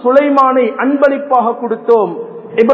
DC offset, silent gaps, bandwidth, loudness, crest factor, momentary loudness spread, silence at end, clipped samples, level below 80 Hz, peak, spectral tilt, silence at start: under 0.1%; none; 7 kHz; -12 LUFS; 12 dB; 9 LU; 0 s; 0.5%; -60 dBFS; 0 dBFS; -7.5 dB/octave; 0 s